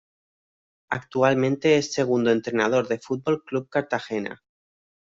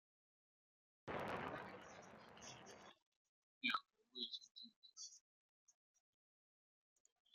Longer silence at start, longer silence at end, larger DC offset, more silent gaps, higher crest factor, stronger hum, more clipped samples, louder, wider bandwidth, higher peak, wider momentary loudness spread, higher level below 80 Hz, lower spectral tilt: second, 0.9 s vs 1.05 s; second, 0.85 s vs 1.65 s; neither; second, none vs 3.02-3.61 s, 4.51-4.55 s, 4.76-4.82 s, 5.21-5.67 s; second, 18 dB vs 28 dB; neither; neither; first, -24 LUFS vs -50 LUFS; second, 7.8 kHz vs 13 kHz; first, -6 dBFS vs -26 dBFS; second, 10 LU vs 18 LU; first, -66 dBFS vs -84 dBFS; first, -5.5 dB/octave vs -2.5 dB/octave